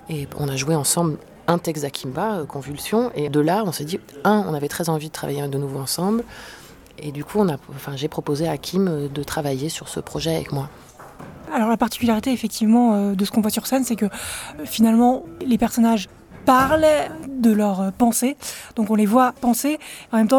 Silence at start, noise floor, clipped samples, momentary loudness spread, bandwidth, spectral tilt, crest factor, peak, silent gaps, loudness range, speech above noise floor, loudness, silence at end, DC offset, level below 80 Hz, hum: 0.05 s; -40 dBFS; under 0.1%; 13 LU; 19 kHz; -5 dB/octave; 18 dB; -2 dBFS; none; 6 LU; 19 dB; -21 LUFS; 0 s; under 0.1%; -50 dBFS; none